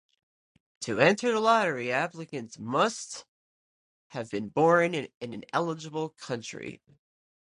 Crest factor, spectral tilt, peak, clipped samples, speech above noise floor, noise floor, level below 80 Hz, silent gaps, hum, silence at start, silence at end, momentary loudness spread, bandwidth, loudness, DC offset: 24 dB; -4.5 dB/octave; -6 dBFS; under 0.1%; over 62 dB; under -90 dBFS; -72 dBFS; 3.28-4.10 s, 5.14-5.21 s; none; 0.8 s; 0.7 s; 17 LU; 11 kHz; -27 LUFS; under 0.1%